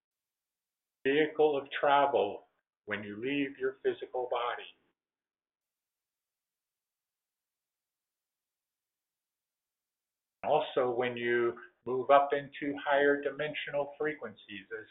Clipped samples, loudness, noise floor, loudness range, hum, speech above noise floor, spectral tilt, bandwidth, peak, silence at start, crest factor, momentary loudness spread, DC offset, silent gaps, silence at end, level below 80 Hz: under 0.1%; -31 LUFS; under -90 dBFS; 10 LU; none; over 59 dB; -2.5 dB/octave; 4 kHz; -10 dBFS; 1.05 s; 24 dB; 16 LU; under 0.1%; none; 0.05 s; -78 dBFS